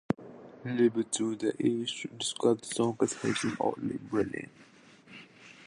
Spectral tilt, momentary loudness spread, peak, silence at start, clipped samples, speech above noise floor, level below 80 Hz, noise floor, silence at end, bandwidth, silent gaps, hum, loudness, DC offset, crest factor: -4.5 dB/octave; 22 LU; -12 dBFS; 0.1 s; under 0.1%; 23 dB; -68 dBFS; -54 dBFS; 0 s; 11.5 kHz; none; none; -31 LUFS; under 0.1%; 20 dB